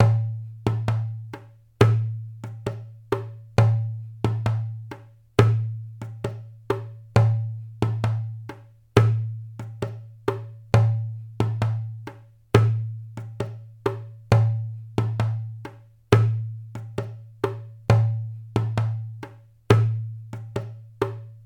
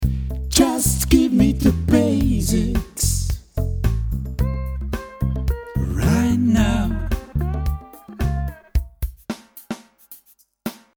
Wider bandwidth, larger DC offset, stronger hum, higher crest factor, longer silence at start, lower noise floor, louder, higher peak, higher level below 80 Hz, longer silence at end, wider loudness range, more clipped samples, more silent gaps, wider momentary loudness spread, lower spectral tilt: second, 9.2 kHz vs over 20 kHz; neither; neither; about the same, 24 dB vs 20 dB; about the same, 0 s vs 0 s; second, -43 dBFS vs -55 dBFS; second, -25 LUFS vs -21 LUFS; about the same, 0 dBFS vs 0 dBFS; second, -48 dBFS vs -26 dBFS; second, 0.05 s vs 0.25 s; second, 2 LU vs 9 LU; neither; neither; about the same, 17 LU vs 16 LU; first, -7.5 dB/octave vs -5.5 dB/octave